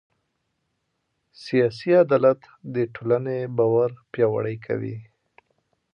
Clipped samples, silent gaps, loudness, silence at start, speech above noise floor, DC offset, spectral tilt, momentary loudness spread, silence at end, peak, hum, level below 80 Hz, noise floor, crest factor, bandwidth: under 0.1%; none; -23 LUFS; 1.4 s; 53 dB; under 0.1%; -8.5 dB/octave; 12 LU; 0.9 s; -6 dBFS; none; -68 dBFS; -75 dBFS; 18 dB; 6.8 kHz